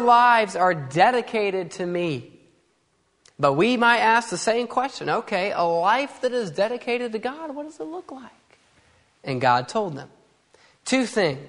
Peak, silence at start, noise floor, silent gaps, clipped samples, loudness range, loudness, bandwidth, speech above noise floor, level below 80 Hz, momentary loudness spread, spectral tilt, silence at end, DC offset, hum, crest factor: -2 dBFS; 0 s; -67 dBFS; none; under 0.1%; 7 LU; -22 LUFS; 11 kHz; 45 dB; -68 dBFS; 17 LU; -4.5 dB/octave; 0 s; under 0.1%; none; 20 dB